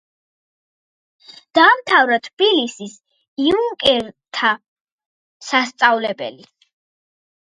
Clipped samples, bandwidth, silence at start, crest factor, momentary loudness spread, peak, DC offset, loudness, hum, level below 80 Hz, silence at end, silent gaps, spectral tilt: under 0.1%; 11.5 kHz; 1.55 s; 20 dB; 17 LU; 0 dBFS; under 0.1%; -16 LUFS; none; -58 dBFS; 1.25 s; 2.33-2.37 s, 3.28-3.36 s, 4.68-4.85 s, 4.92-4.98 s, 5.06-5.40 s; -2.5 dB/octave